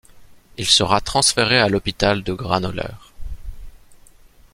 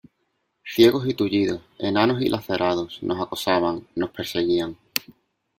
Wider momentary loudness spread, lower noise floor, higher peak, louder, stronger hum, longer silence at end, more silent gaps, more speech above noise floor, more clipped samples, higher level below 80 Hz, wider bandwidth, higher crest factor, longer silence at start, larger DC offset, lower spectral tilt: first, 23 LU vs 11 LU; second, -48 dBFS vs -73 dBFS; about the same, -2 dBFS vs 0 dBFS; first, -18 LUFS vs -23 LUFS; neither; about the same, 0.55 s vs 0.6 s; neither; second, 29 dB vs 51 dB; neither; first, -38 dBFS vs -58 dBFS; about the same, 16 kHz vs 16.5 kHz; about the same, 20 dB vs 22 dB; second, 0.15 s vs 0.65 s; neither; second, -3 dB/octave vs -5.5 dB/octave